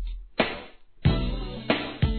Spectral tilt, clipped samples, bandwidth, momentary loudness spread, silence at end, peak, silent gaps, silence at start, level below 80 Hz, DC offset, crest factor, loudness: -9.5 dB/octave; under 0.1%; 4.6 kHz; 9 LU; 0 s; -8 dBFS; none; 0 s; -34 dBFS; 0.2%; 20 dB; -28 LUFS